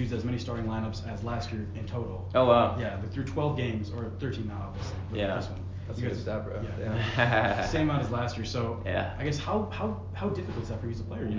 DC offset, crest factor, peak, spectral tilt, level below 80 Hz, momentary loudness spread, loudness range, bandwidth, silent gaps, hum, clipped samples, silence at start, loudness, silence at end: under 0.1%; 22 dB; -8 dBFS; -7 dB/octave; -42 dBFS; 11 LU; 4 LU; 7.6 kHz; none; none; under 0.1%; 0 s; -31 LUFS; 0 s